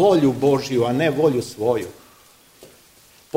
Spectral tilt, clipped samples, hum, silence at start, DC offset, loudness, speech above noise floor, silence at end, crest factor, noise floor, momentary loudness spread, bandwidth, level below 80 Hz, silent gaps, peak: -6.5 dB/octave; under 0.1%; none; 0 s; under 0.1%; -20 LUFS; 33 dB; 0 s; 16 dB; -52 dBFS; 6 LU; 16 kHz; -56 dBFS; none; -4 dBFS